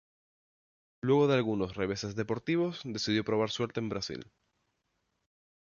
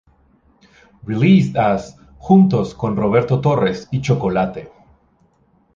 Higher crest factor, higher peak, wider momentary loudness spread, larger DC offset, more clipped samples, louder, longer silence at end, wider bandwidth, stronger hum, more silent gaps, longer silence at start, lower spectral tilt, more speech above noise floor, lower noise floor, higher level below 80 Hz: about the same, 18 dB vs 16 dB; second, -16 dBFS vs -2 dBFS; second, 10 LU vs 15 LU; neither; neither; second, -31 LUFS vs -17 LUFS; first, 1.5 s vs 1.1 s; about the same, 7.2 kHz vs 7.4 kHz; neither; neither; about the same, 1.05 s vs 1.05 s; second, -5.5 dB/octave vs -8 dB/octave; first, 49 dB vs 42 dB; first, -80 dBFS vs -58 dBFS; second, -62 dBFS vs -46 dBFS